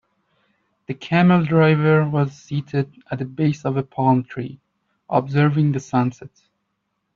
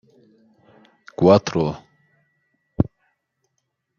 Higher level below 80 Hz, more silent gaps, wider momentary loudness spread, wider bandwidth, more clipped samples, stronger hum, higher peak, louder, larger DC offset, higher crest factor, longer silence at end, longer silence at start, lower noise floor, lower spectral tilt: second, -58 dBFS vs -50 dBFS; neither; second, 14 LU vs 19 LU; about the same, 7.2 kHz vs 7.2 kHz; neither; neither; about the same, -2 dBFS vs -2 dBFS; about the same, -19 LUFS vs -20 LUFS; neither; about the same, 18 dB vs 22 dB; second, 0.9 s vs 1.15 s; second, 0.9 s vs 1.2 s; about the same, -74 dBFS vs -75 dBFS; about the same, -8 dB/octave vs -7 dB/octave